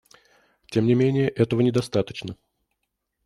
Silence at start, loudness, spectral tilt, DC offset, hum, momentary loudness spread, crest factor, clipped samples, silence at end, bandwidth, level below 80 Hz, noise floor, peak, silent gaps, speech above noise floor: 0.7 s; -23 LUFS; -7.5 dB/octave; under 0.1%; none; 12 LU; 18 dB; under 0.1%; 0.9 s; 12 kHz; -58 dBFS; -78 dBFS; -6 dBFS; none; 57 dB